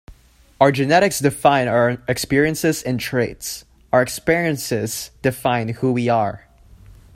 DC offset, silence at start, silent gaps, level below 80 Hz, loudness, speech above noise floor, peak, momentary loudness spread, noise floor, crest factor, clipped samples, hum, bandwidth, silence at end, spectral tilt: under 0.1%; 0.1 s; none; -48 dBFS; -19 LUFS; 31 dB; 0 dBFS; 9 LU; -49 dBFS; 20 dB; under 0.1%; none; 16 kHz; 0.8 s; -5 dB/octave